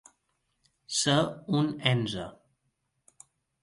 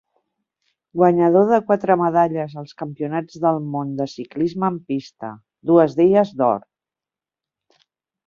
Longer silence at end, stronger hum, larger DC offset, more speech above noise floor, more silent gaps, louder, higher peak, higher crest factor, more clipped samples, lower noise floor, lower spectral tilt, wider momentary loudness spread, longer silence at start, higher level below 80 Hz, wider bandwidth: second, 1.3 s vs 1.7 s; neither; neither; second, 50 dB vs 71 dB; neither; second, -28 LUFS vs -19 LUFS; second, -8 dBFS vs -2 dBFS; first, 24 dB vs 18 dB; neither; second, -78 dBFS vs -89 dBFS; second, -4.5 dB/octave vs -8.5 dB/octave; second, 11 LU vs 16 LU; about the same, 0.9 s vs 0.95 s; about the same, -64 dBFS vs -64 dBFS; first, 11.5 kHz vs 7 kHz